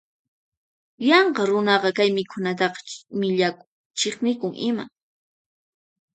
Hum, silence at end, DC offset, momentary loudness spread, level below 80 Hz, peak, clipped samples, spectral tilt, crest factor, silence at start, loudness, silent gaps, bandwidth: none; 1.25 s; under 0.1%; 13 LU; -74 dBFS; -2 dBFS; under 0.1%; -4 dB/octave; 22 dB; 1 s; -22 LUFS; 3.67-3.90 s; 9.2 kHz